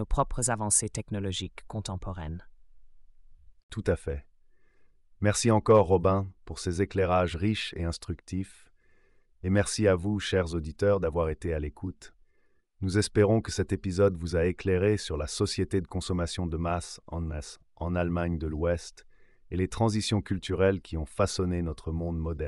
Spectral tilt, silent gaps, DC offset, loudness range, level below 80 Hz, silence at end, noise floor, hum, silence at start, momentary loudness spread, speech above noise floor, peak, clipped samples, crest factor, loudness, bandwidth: -5 dB/octave; 3.63-3.69 s; under 0.1%; 6 LU; -42 dBFS; 0 s; -65 dBFS; none; 0 s; 13 LU; 37 dB; -10 dBFS; under 0.1%; 18 dB; -29 LUFS; 12 kHz